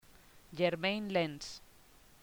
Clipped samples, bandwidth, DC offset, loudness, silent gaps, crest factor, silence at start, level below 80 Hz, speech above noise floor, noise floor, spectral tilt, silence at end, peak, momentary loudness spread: under 0.1%; over 20 kHz; under 0.1%; -35 LUFS; none; 20 dB; 0.35 s; -66 dBFS; 27 dB; -61 dBFS; -5 dB/octave; 0.6 s; -18 dBFS; 17 LU